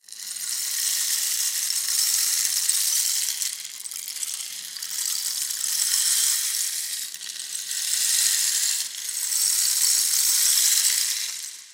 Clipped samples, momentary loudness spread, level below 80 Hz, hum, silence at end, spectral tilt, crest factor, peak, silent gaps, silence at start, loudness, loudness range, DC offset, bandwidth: under 0.1%; 12 LU; -72 dBFS; none; 0 s; 5.5 dB/octave; 20 dB; -4 dBFS; none; 0.1 s; -21 LUFS; 5 LU; under 0.1%; 17 kHz